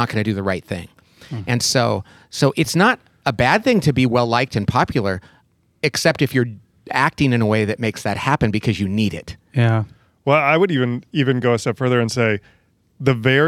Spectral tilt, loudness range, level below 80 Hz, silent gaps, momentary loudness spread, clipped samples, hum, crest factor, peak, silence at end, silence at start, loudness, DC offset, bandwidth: -5.5 dB/octave; 2 LU; -48 dBFS; none; 10 LU; under 0.1%; none; 18 dB; -2 dBFS; 0 s; 0 s; -19 LUFS; under 0.1%; 15 kHz